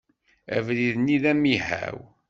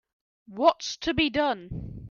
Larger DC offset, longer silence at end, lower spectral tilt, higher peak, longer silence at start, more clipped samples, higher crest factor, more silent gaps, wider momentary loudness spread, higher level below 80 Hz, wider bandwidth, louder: neither; first, 0.25 s vs 0 s; first, -6.5 dB/octave vs -4.5 dB/octave; about the same, -8 dBFS vs -8 dBFS; about the same, 0.5 s vs 0.5 s; neither; about the same, 18 dB vs 20 dB; neither; second, 9 LU vs 15 LU; second, -58 dBFS vs -48 dBFS; about the same, 7.6 kHz vs 7.2 kHz; about the same, -24 LUFS vs -26 LUFS